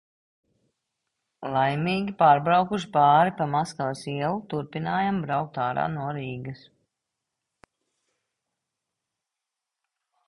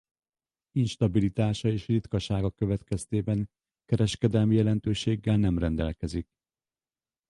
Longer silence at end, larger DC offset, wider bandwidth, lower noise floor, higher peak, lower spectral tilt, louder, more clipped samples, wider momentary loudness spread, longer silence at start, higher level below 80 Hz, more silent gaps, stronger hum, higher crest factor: first, 3.7 s vs 1.05 s; neither; about the same, 11.5 kHz vs 11.5 kHz; second, -86 dBFS vs under -90 dBFS; first, -6 dBFS vs -10 dBFS; about the same, -6.5 dB/octave vs -7 dB/octave; first, -24 LUFS vs -28 LUFS; neither; first, 13 LU vs 7 LU; first, 1.4 s vs 0.75 s; second, -64 dBFS vs -44 dBFS; neither; neither; about the same, 20 dB vs 18 dB